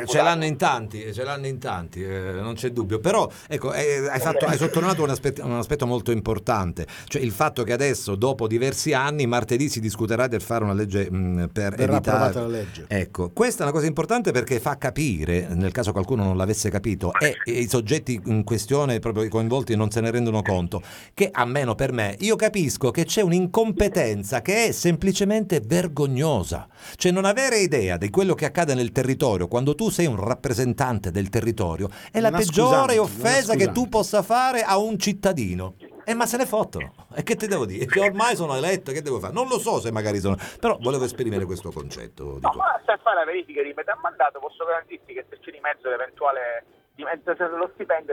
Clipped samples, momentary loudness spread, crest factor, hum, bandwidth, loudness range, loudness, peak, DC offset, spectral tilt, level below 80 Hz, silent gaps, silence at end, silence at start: under 0.1%; 9 LU; 18 dB; none; 19 kHz; 4 LU; -23 LUFS; -4 dBFS; under 0.1%; -5 dB/octave; -46 dBFS; none; 0 s; 0 s